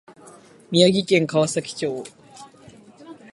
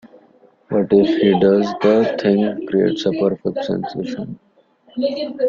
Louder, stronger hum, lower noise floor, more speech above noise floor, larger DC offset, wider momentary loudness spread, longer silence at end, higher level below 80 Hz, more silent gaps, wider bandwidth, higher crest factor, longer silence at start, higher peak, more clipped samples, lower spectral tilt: about the same, -20 LUFS vs -18 LUFS; neither; second, -48 dBFS vs -53 dBFS; second, 28 dB vs 36 dB; neither; about the same, 14 LU vs 12 LU; first, 0.2 s vs 0 s; second, -64 dBFS vs -56 dBFS; neither; first, 11.5 kHz vs 7.2 kHz; first, 22 dB vs 16 dB; about the same, 0.7 s vs 0.7 s; about the same, -2 dBFS vs -2 dBFS; neither; second, -4.5 dB/octave vs -7.5 dB/octave